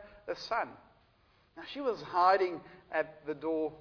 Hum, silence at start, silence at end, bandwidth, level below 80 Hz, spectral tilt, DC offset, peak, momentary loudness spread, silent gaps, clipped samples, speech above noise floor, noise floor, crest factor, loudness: none; 0 s; 0 s; 5.4 kHz; -70 dBFS; -5 dB/octave; under 0.1%; -14 dBFS; 16 LU; none; under 0.1%; 35 dB; -68 dBFS; 20 dB; -33 LUFS